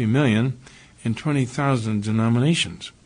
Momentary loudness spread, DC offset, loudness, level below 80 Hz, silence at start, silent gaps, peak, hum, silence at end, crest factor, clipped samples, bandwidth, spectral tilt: 9 LU; under 0.1%; -22 LUFS; -54 dBFS; 0 s; none; -8 dBFS; none; 0.15 s; 14 dB; under 0.1%; 10 kHz; -6 dB/octave